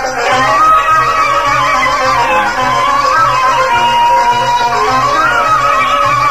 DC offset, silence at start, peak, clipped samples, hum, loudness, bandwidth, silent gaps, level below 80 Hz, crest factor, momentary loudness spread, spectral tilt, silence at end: 2%; 0 s; 0 dBFS; under 0.1%; none; -9 LUFS; 15.5 kHz; none; -36 dBFS; 10 dB; 3 LU; -2.5 dB/octave; 0 s